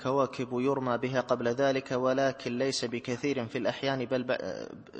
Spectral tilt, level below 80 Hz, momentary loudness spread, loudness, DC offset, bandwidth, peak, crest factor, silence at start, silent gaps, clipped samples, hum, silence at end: -5 dB/octave; -68 dBFS; 5 LU; -30 LUFS; under 0.1%; 8.8 kHz; -12 dBFS; 18 dB; 0 s; none; under 0.1%; none; 0 s